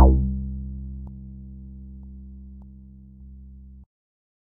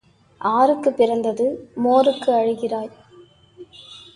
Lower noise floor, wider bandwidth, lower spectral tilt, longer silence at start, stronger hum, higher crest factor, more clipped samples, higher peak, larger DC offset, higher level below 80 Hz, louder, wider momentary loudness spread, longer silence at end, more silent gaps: second, -45 dBFS vs -49 dBFS; second, 1.3 kHz vs 11 kHz; about the same, -6 dB/octave vs -6 dB/octave; second, 0 s vs 0.4 s; neither; first, 24 dB vs 18 dB; neither; about the same, -2 dBFS vs -4 dBFS; neither; first, -28 dBFS vs -64 dBFS; second, -28 LUFS vs -19 LUFS; first, 19 LU vs 13 LU; first, 0.9 s vs 0.15 s; neither